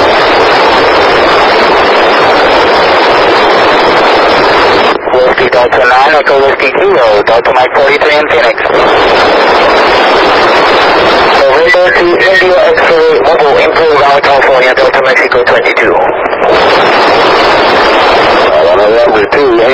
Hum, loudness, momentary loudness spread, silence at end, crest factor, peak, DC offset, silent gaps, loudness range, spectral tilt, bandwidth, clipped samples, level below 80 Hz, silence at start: none; -5 LUFS; 2 LU; 0 s; 6 dB; 0 dBFS; 0.6%; none; 1 LU; -4 dB/octave; 8 kHz; 6%; -34 dBFS; 0 s